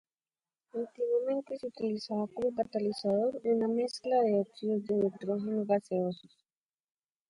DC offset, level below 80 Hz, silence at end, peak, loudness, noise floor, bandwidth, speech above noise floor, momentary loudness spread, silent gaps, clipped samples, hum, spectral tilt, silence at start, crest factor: under 0.1%; -76 dBFS; 1.15 s; -16 dBFS; -32 LUFS; under -90 dBFS; 10.5 kHz; over 58 dB; 7 LU; none; under 0.1%; none; -7 dB/octave; 0.75 s; 16 dB